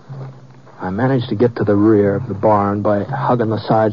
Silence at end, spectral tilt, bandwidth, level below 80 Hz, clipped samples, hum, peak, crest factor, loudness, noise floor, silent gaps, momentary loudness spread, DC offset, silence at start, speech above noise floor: 0 s; -7.5 dB/octave; 6.8 kHz; -54 dBFS; under 0.1%; none; -2 dBFS; 14 dB; -16 LUFS; -40 dBFS; none; 15 LU; 0.5%; 0.1 s; 25 dB